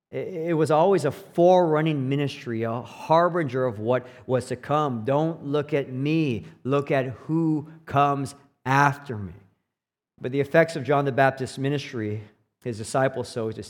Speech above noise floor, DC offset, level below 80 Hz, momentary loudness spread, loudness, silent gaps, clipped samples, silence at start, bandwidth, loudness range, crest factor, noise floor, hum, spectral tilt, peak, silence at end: 64 dB; under 0.1%; -68 dBFS; 12 LU; -24 LUFS; none; under 0.1%; 0.1 s; 16.5 kHz; 3 LU; 20 dB; -87 dBFS; none; -7 dB/octave; -4 dBFS; 0 s